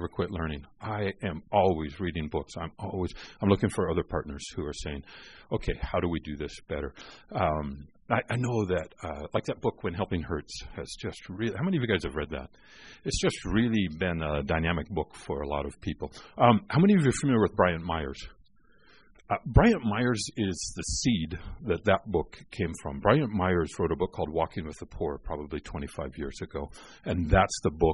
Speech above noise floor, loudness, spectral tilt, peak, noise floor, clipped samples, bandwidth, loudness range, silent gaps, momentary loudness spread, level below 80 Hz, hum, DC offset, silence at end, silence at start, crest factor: 33 dB; -29 LUFS; -6 dB/octave; -6 dBFS; -62 dBFS; under 0.1%; 10.5 kHz; 7 LU; none; 14 LU; -42 dBFS; none; 0.1%; 0 s; 0 s; 22 dB